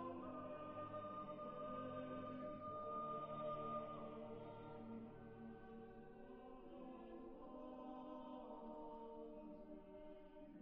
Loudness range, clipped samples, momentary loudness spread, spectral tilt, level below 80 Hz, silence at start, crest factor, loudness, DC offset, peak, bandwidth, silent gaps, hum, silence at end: 7 LU; under 0.1%; 11 LU; -6 dB/octave; -70 dBFS; 0 s; 16 dB; -53 LUFS; under 0.1%; -38 dBFS; 5.6 kHz; none; none; 0 s